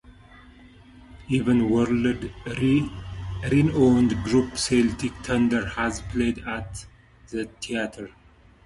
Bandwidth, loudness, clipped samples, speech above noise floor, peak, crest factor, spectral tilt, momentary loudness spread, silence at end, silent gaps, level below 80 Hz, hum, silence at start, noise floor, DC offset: 11.5 kHz; -24 LUFS; under 0.1%; 26 dB; -8 dBFS; 18 dB; -6 dB/octave; 14 LU; 0.55 s; none; -44 dBFS; none; 0.1 s; -49 dBFS; under 0.1%